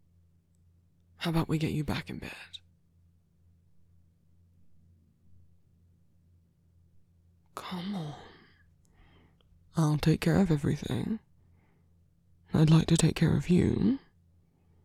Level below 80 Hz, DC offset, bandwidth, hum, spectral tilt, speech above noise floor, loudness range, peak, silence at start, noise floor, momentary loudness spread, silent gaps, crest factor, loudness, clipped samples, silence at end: -52 dBFS; under 0.1%; 13.5 kHz; none; -6.5 dB/octave; 38 dB; 16 LU; -10 dBFS; 1.2 s; -65 dBFS; 19 LU; none; 22 dB; -29 LUFS; under 0.1%; 0.85 s